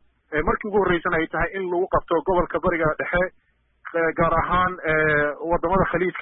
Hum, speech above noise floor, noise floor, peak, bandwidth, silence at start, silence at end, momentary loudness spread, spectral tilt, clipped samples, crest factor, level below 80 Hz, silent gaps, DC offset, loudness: none; 22 dB; -44 dBFS; -10 dBFS; 4 kHz; 0.3 s; 0 s; 5 LU; -11 dB/octave; under 0.1%; 14 dB; -38 dBFS; none; under 0.1%; -22 LUFS